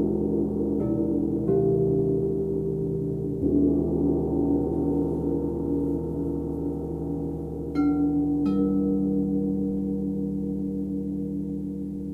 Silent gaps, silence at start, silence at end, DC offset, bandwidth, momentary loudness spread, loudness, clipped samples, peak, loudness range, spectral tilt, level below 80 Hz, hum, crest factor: none; 0 s; 0 s; under 0.1%; 4.3 kHz; 7 LU; -26 LUFS; under 0.1%; -12 dBFS; 3 LU; -11.5 dB/octave; -42 dBFS; none; 14 dB